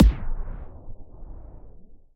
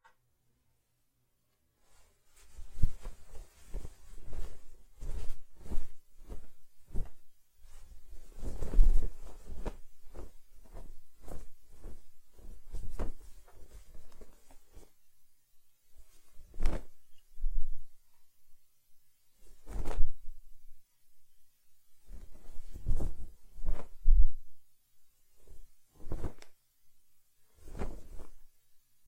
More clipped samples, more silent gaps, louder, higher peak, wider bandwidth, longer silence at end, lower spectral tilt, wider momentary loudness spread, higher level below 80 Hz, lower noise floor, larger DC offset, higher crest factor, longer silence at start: neither; neither; first, -28 LUFS vs -42 LUFS; first, -4 dBFS vs -8 dBFS; first, 4.9 kHz vs 2.4 kHz; second, 0.2 s vs 0.6 s; first, -8.5 dB/octave vs -6.5 dB/octave; second, 16 LU vs 22 LU; first, -28 dBFS vs -36 dBFS; second, -44 dBFS vs -77 dBFS; neither; about the same, 22 dB vs 22 dB; second, 0 s vs 2.5 s